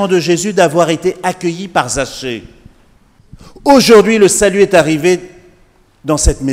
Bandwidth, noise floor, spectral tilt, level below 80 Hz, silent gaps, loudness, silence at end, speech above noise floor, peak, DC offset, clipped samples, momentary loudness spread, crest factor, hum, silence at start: 16.5 kHz; -49 dBFS; -4 dB/octave; -28 dBFS; none; -11 LUFS; 0 s; 38 dB; 0 dBFS; under 0.1%; 0.6%; 13 LU; 12 dB; none; 0 s